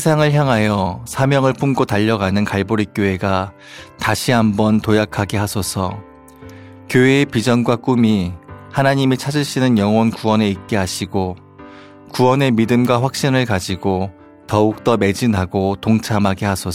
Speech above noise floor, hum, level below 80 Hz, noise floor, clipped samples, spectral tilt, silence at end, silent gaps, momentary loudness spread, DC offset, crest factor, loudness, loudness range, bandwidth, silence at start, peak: 23 dB; none; -48 dBFS; -39 dBFS; under 0.1%; -6 dB/octave; 0 s; none; 8 LU; under 0.1%; 16 dB; -17 LUFS; 2 LU; 16 kHz; 0 s; 0 dBFS